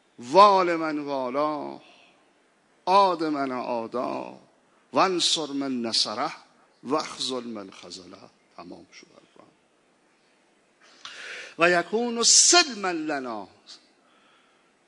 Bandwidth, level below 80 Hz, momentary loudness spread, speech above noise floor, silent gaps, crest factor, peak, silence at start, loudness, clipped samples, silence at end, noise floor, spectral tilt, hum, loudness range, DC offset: 11 kHz; -82 dBFS; 25 LU; 40 dB; none; 22 dB; -4 dBFS; 0.2 s; -22 LUFS; under 0.1%; 1.15 s; -64 dBFS; -1.5 dB/octave; none; 13 LU; under 0.1%